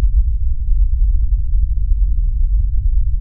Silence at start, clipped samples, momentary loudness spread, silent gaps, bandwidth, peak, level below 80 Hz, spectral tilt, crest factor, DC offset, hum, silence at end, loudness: 0 s; under 0.1%; 2 LU; none; 0.3 kHz; -4 dBFS; -14 dBFS; -15.5 dB/octave; 10 dB; under 0.1%; none; 0 s; -20 LUFS